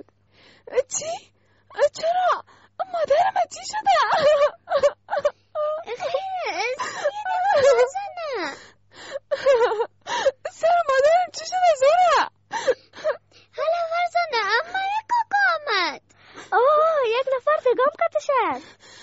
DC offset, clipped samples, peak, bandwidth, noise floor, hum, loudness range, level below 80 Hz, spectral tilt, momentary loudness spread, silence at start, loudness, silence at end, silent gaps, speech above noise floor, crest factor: under 0.1%; under 0.1%; -8 dBFS; 8 kHz; -56 dBFS; none; 3 LU; -62 dBFS; 0.5 dB/octave; 11 LU; 0.7 s; -22 LUFS; 0.05 s; none; 34 dB; 16 dB